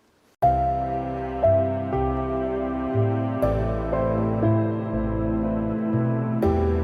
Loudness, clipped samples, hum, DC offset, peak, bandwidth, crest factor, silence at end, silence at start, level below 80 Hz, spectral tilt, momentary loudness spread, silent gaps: -24 LUFS; under 0.1%; none; under 0.1%; -8 dBFS; 4.9 kHz; 14 dB; 0 s; 0.4 s; -36 dBFS; -10.5 dB/octave; 5 LU; none